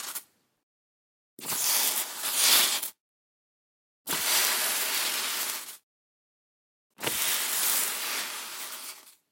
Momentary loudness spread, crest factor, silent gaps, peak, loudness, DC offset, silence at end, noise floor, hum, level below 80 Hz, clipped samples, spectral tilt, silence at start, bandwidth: 16 LU; 28 dB; 0.63-1.37 s, 3.00-4.05 s, 5.83-6.90 s; -4 dBFS; -25 LUFS; under 0.1%; 0.2 s; under -90 dBFS; none; -78 dBFS; under 0.1%; 1.5 dB/octave; 0 s; 17 kHz